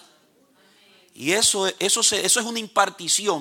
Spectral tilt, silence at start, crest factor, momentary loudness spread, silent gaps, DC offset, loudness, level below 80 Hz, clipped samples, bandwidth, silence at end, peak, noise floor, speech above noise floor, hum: -0.5 dB/octave; 1.2 s; 20 dB; 6 LU; none; under 0.1%; -20 LUFS; -66 dBFS; under 0.1%; 17 kHz; 0 s; -4 dBFS; -59 dBFS; 37 dB; none